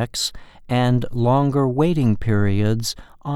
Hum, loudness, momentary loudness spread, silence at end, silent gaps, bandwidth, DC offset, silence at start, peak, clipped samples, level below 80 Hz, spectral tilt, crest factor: none; -20 LUFS; 7 LU; 0 s; none; 15 kHz; under 0.1%; 0 s; -6 dBFS; under 0.1%; -38 dBFS; -6 dB/octave; 14 dB